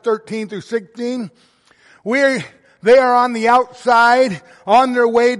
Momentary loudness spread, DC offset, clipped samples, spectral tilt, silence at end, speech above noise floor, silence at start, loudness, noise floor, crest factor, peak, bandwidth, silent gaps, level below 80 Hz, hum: 15 LU; under 0.1%; under 0.1%; -4.5 dB/octave; 0 s; 36 dB; 0.05 s; -15 LUFS; -51 dBFS; 14 dB; -2 dBFS; 11.5 kHz; none; -60 dBFS; none